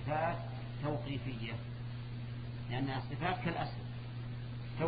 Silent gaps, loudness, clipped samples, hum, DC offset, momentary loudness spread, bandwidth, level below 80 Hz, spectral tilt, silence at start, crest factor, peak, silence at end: none; -40 LUFS; under 0.1%; none; under 0.1%; 8 LU; 5 kHz; -54 dBFS; -5.5 dB/octave; 0 s; 20 dB; -18 dBFS; 0 s